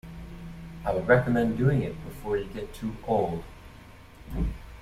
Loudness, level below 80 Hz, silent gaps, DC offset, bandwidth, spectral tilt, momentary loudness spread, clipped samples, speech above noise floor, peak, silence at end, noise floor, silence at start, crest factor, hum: -28 LUFS; -40 dBFS; none; under 0.1%; 15 kHz; -8 dB/octave; 20 LU; under 0.1%; 22 dB; -6 dBFS; 0 s; -48 dBFS; 0.05 s; 22 dB; none